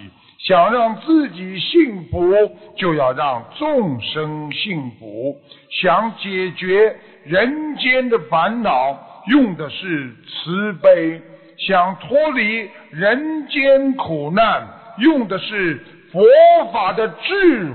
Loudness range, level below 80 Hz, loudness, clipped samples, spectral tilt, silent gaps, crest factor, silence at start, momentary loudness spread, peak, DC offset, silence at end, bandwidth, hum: 5 LU; -50 dBFS; -17 LUFS; under 0.1%; -9 dB/octave; none; 14 dB; 0 s; 12 LU; -2 dBFS; under 0.1%; 0 s; 4.6 kHz; none